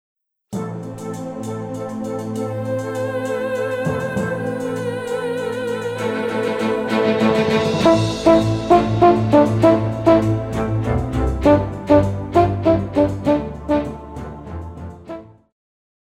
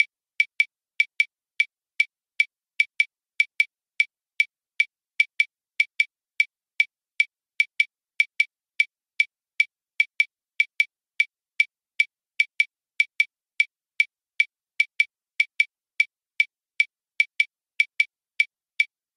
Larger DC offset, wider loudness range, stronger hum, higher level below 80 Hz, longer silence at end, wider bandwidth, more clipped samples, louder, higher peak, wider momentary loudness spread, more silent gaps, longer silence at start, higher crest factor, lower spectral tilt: neither; first, 9 LU vs 1 LU; neither; first, -36 dBFS vs -80 dBFS; first, 0.8 s vs 0.3 s; about the same, 14.5 kHz vs 14 kHz; neither; first, -19 LUFS vs -24 LUFS; first, 0 dBFS vs -6 dBFS; first, 15 LU vs 3 LU; neither; first, 0.5 s vs 0 s; about the same, 18 dB vs 22 dB; first, -7 dB/octave vs 5.5 dB/octave